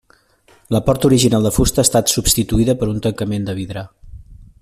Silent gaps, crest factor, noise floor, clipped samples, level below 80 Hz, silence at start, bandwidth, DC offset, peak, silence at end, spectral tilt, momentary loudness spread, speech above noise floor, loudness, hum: none; 18 dB; -53 dBFS; under 0.1%; -32 dBFS; 0.7 s; 16 kHz; under 0.1%; 0 dBFS; 0.2 s; -4.5 dB/octave; 12 LU; 38 dB; -16 LUFS; none